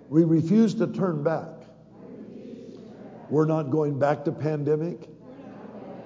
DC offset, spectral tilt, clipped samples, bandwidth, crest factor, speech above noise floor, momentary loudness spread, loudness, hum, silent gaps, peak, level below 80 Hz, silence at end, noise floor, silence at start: under 0.1%; -9 dB/octave; under 0.1%; 7.8 kHz; 18 dB; 24 dB; 23 LU; -24 LUFS; none; none; -8 dBFS; -68 dBFS; 0 s; -47 dBFS; 0.1 s